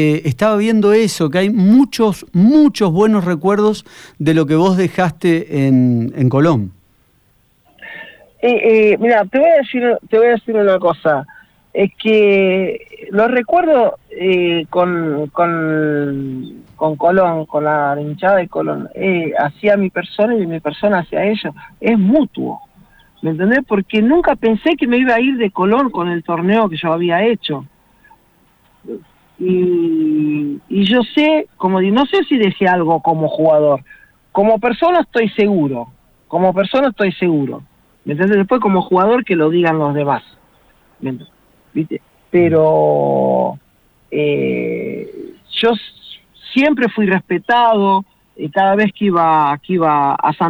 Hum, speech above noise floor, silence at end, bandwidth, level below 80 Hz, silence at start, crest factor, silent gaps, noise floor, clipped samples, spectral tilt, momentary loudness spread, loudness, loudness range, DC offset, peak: none; 42 dB; 0 s; over 20 kHz; -52 dBFS; 0 s; 12 dB; none; -56 dBFS; under 0.1%; -7 dB/octave; 12 LU; -14 LUFS; 4 LU; under 0.1%; -2 dBFS